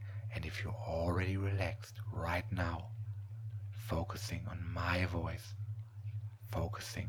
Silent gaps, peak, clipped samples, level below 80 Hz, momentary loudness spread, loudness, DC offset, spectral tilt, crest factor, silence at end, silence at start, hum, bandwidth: none; -20 dBFS; under 0.1%; -54 dBFS; 10 LU; -40 LUFS; under 0.1%; -6 dB/octave; 20 dB; 0 s; 0 s; none; 17.5 kHz